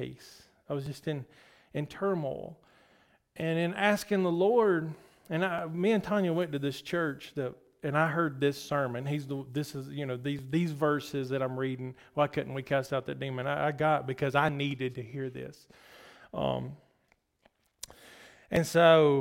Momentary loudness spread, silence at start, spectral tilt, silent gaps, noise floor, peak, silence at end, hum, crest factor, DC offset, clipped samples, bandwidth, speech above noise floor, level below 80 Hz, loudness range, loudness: 13 LU; 0 s; -6 dB/octave; none; -72 dBFS; -10 dBFS; 0 s; none; 20 dB; under 0.1%; under 0.1%; 16.5 kHz; 42 dB; -64 dBFS; 9 LU; -31 LUFS